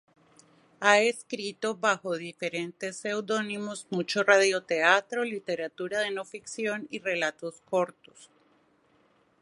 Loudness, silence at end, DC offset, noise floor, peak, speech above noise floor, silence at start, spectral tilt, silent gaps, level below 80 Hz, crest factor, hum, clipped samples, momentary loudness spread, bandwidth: -28 LUFS; 1.15 s; under 0.1%; -66 dBFS; -4 dBFS; 37 dB; 0.8 s; -3 dB/octave; none; -80 dBFS; 24 dB; none; under 0.1%; 13 LU; 11.5 kHz